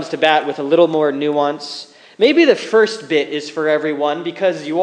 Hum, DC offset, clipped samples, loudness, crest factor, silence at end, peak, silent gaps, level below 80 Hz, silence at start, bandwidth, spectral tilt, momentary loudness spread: none; under 0.1%; under 0.1%; -16 LUFS; 16 dB; 0 s; 0 dBFS; none; -74 dBFS; 0 s; 9.8 kHz; -4.5 dB/octave; 8 LU